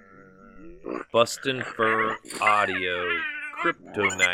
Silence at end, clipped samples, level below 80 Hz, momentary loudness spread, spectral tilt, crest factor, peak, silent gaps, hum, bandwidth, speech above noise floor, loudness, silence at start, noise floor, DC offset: 0 s; under 0.1%; -60 dBFS; 8 LU; -3 dB/octave; 22 dB; -4 dBFS; none; none; 18 kHz; 25 dB; -25 LUFS; 0.15 s; -50 dBFS; under 0.1%